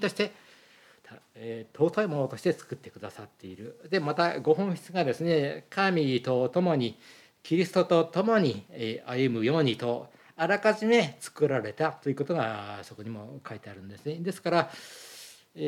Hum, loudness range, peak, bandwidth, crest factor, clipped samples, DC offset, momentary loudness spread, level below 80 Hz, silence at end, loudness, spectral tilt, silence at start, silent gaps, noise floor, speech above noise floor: none; 6 LU; -10 dBFS; 15.5 kHz; 20 dB; under 0.1%; under 0.1%; 19 LU; -80 dBFS; 0 s; -28 LUFS; -6 dB/octave; 0 s; none; -58 dBFS; 30 dB